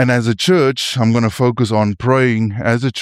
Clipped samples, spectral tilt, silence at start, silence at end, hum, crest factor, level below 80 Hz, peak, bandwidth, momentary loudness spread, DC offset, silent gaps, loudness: under 0.1%; -6 dB/octave; 0 s; 0 s; none; 12 dB; -48 dBFS; -2 dBFS; 14.5 kHz; 4 LU; under 0.1%; none; -15 LUFS